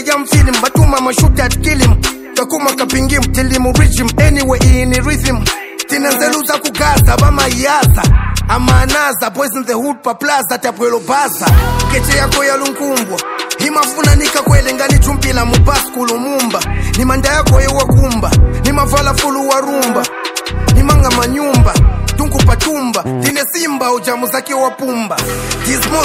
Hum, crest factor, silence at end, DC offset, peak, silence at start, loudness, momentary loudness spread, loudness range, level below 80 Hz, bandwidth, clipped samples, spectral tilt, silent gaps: none; 10 dB; 0 s; under 0.1%; 0 dBFS; 0 s; -12 LUFS; 6 LU; 2 LU; -16 dBFS; 16.5 kHz; 0.7%; -4.5 dB/octave; none